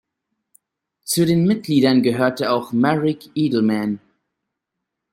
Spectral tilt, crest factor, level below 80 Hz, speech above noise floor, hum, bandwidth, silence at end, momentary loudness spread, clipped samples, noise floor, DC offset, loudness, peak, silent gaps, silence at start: -5.5 dB/octave; 18 dB; -60 dBFS; 63 dB; none; 16.5 kHz; 1.15 s; 7 LU; under 0.1%; -81 dBFS; under 0.1%; -19 LUFS; -2 dBFS; none; 1.05 s